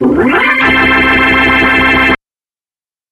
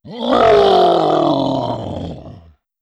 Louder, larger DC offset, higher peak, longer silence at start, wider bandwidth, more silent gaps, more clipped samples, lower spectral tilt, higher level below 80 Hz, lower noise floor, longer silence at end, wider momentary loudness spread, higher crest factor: first, -7 LUFS vs -14 LUFS; neither; first, 0 dBFS vs -4 dBFS; about the same, 0 s vs 0.05 s; first, 13 kHz vs 9.6 kHz; neither; neither; about the same, -5.5 dB/octave vs -6.5 dB/octave; first, -30 dBFS vs -44 dBFS; first, under -90 dBFS vs -43 dBFS; first, 0.95 s vs 0.45 s; second, 2 LU vs 17 LU; about the same, 10 dB vs 12 dB